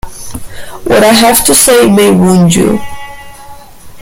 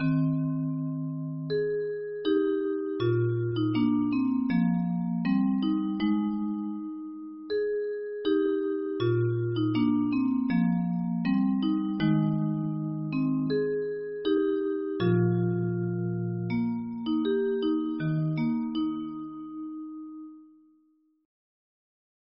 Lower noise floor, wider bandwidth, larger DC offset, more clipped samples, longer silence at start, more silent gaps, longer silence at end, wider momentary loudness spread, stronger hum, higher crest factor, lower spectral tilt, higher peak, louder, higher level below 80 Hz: second, -30 dBFS vs -66 dBFS; first, over 20 kHz vs 5.6 kHz; neither; first, 0.5% vs under 0.1%; about the same, 0.05 s vs 0 s; neither; second, 0 s vs 1.8 s; first, 21 LU vs 9 LU; neither; second, 8 dB vs 14 dB; second, -4 dB/octave vs -7.5 dB/octave; first, 0 dBFS vs -14 dBFS; first, -6 LUFS vs -28 LUFS; first, -32 dBFS vs -62 dBFS